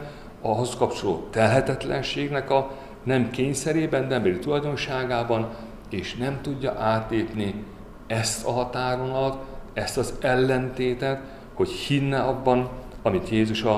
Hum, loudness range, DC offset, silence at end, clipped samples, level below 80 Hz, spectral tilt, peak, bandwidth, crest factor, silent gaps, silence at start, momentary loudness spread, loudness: none; 3 LU; 0.1%; 0 s; under 0.1%; -44 dBFS; -5.5 dB/octave; -6 dBFS; 14.5 kHz; 20 dB; none; 0 s; 10 LU; -25 LUFS